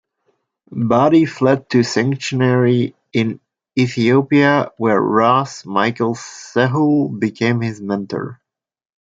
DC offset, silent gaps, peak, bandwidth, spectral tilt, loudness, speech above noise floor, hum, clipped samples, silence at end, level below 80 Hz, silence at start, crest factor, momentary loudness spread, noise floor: under 0.1%; none; -2 dBFS; 7.8 kHz; -6.5 dB/octave; -17 LUFS; 51 dB; none; under 0.1%; 0.8 s; -60 dBFS; 0.7 s; 16 dB; 10 LU; -66 dBFS